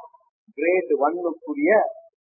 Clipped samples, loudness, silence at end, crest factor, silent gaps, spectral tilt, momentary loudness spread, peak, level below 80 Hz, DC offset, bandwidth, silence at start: under 0.1%; -22 LUFS; 0.25 s; 18 dB; 0.29-0.47 s; -13 dB/octave; 9 LU; -6 dBFS; -82 dBFS; under 0.1%; 2.7 kHz; 0 s